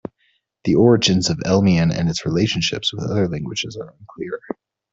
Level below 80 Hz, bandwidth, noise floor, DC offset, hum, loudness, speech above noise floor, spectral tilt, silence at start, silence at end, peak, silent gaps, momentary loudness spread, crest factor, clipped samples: -48 dBFS; 8 kHz; -65 dBFS; under 0.1%; none; -18 LUFS; 47 dB; -5.5 dB/octave; 0.65 s; 0.4 s; -2 dBFS; none; 19 LU; 16 dB; under 0.1%